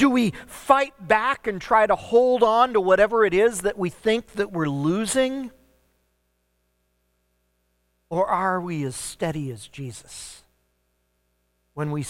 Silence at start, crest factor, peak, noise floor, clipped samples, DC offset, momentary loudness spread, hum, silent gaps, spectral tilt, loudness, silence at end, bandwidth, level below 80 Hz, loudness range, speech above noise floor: 0 s; 22 dB; -2 dBFS; -71 dBFS; under 0.1%; under 0.1%; 18 LU; none; none; -5 dB/octave; -22 LUFS; 0 s; 16.5 kHz; -54 dBFS; 12 LU; 49 dB